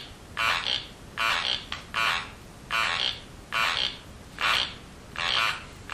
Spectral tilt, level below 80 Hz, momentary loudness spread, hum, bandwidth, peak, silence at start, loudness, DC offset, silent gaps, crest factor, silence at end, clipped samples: -1 dB/octave; -52 dBFS; 15 LU; none; 15.5 kHz; -10 dBFS; 0 s; -26 LUFS; under 0.1%; none; 20 dB; 0 s; under 0.1%